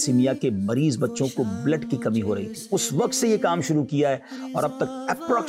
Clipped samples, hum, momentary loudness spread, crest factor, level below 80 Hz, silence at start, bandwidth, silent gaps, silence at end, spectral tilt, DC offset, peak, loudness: under 0.1%; none; 6 LU; 12 dB; -66 dBFS; 0 s; 16 kHz; none; 0 s; -5.5 dB/octave; under 0.1%; -10 dBFS; -24 LUFS